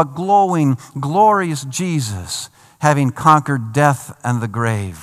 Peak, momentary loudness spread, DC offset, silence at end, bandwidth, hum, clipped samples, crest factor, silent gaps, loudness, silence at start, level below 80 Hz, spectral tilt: 0 dBFS; 10 LU; under 0.1%; 0 s; 15 kHz; none; under 0.1%; 16 dB; none; -17 LUFS; 0 s; -58 dBFS; -5.5 dB/octave